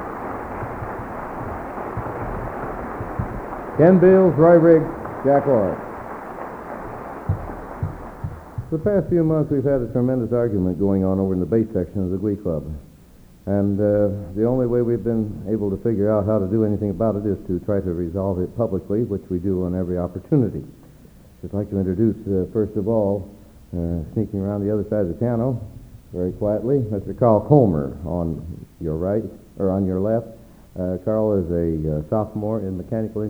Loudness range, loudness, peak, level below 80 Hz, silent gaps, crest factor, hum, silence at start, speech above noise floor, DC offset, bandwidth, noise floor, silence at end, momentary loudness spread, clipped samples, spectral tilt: 8 LU; -21 LUFS; 0 dBFS; -42 dBFS; none; 22 dB; none; 0 s; 27 dB; under 0.1%; over 20 kHz; -47 dBFS; 0 s; 14 LU; under 0.1%; -11 dB/octave